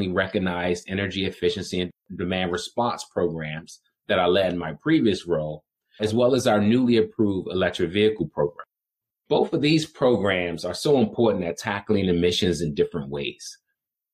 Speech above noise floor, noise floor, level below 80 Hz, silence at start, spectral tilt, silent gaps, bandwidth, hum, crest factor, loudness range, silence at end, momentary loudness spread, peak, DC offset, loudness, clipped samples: 65 dB; -88 dBFS; -54 dBFS; 0 s; -5.5 dB/octave; none; 14.5 kHz; none; 16 dB; 4 LU; 0.6 s; 9 LU; -8 dBFS; under 0.1%; -24 LUFS; under 0.1%